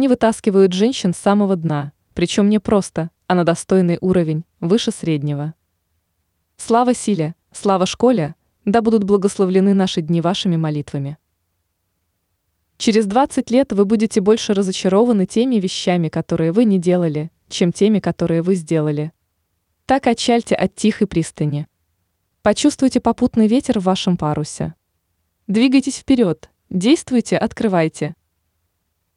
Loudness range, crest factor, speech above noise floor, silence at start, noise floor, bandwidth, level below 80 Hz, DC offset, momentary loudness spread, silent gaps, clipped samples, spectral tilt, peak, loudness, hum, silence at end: 4 LU; 14 dB; 54 dB; 0 s; -70 dBFS; 11 kHz; -50 dBFS; under 0.1%; 10 LU; none; under 0.1%; -6 dB/octave; -4 dBFS; -17 LUFS; none; 1.05 s